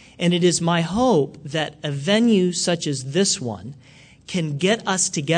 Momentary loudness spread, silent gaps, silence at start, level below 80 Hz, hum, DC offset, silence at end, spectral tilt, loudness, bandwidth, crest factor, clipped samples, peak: 9 LU; none; 0.2 s; -54 dBFS; none; under 0.1%; 0 s; -4 dB/octave; -21 LUFS; 9.4 kHz; 16 dB; under 0.1%; -6 dBFS